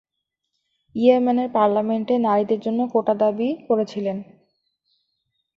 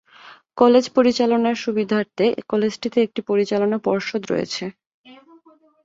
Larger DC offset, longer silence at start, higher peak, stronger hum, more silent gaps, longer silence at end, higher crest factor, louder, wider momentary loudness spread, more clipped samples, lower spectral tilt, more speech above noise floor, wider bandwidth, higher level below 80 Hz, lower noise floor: neither; first, 0.95 s vs 0.25 s; about the same, -4 dBFS vs -2 dBFS; neither; second, none vs 4.86-5.04 s; first, 1.35 s vs 0.7 s; about the same, 18 dB vs 18 dB; about the same, -21 LUFS vs -20 LUFS; about the same, 9 LU vs 9 LU; neither; first, -8 dB/octave vs -5.5 dB/octave; first, 60 dB vs 34 dB; second, 6.8 kHz vs 7.8 kHz; about the same, -68 dBFS vs -64 dBFS; first, -80 dBFS vs -53 dBFS